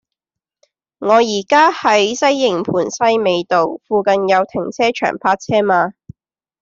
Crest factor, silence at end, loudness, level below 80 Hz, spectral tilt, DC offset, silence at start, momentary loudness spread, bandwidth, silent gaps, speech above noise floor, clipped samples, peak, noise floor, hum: 14 dB; 0.7 s; -15 LUFS; -58 dBFS; -4 dB/octave; under 0.1%; 1 s; 6 LU; 7.8 kHz; none; 69 dB; under 0.1%; -2 dBFS; -84 dBFS; none